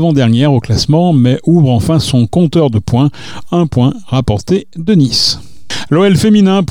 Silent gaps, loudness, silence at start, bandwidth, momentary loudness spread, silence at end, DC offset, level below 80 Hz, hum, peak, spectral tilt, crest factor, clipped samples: none; -11 LUFS; 0 s; 16 kHz; 7 LU; 0.05 s; under 0.1%; -38 dBFS; none; 0 dBFS; -6.5 dB/octave; 10 dB; under 0.1%